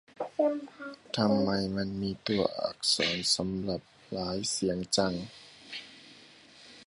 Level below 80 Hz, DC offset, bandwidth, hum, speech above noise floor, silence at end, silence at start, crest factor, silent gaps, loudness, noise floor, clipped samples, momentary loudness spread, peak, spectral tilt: -60 dBFS; under 0.1%; 11.5 kHz; none; 24 dB; 0.05 s; 0.2 s; 22 dB; none; -30 LUFS; -55 dBFS; under 0.1%; 17 LU; -10 dBFS; -4 dB/octave